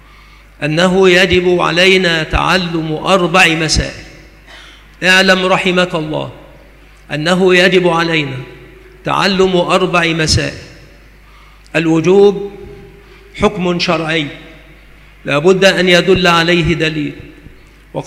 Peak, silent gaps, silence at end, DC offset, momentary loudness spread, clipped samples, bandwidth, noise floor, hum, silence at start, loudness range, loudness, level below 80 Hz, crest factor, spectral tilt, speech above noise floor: 0 dBFS; none; 0 s; under 0.1%; 14 LU; under 0.1%; 14.5 kHz; -40 dBFS; none; 0.6 s; 4 LU; -11 LUFS; -34 dBFS; 14 dB; -4.5 dB/octave; 29 dB